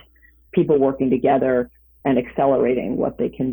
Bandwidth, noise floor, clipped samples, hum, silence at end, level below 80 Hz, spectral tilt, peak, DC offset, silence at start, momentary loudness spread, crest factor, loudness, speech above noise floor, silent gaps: over 20 kHz; -53 dBFS; under 0.1%; none; 0 s; -50 dBFS; -12.5 dB/octave; -6 dBFS; under 0.1%; 0.55 s; 7 LU; 14 dB; -20 LUFS; 35 dB; none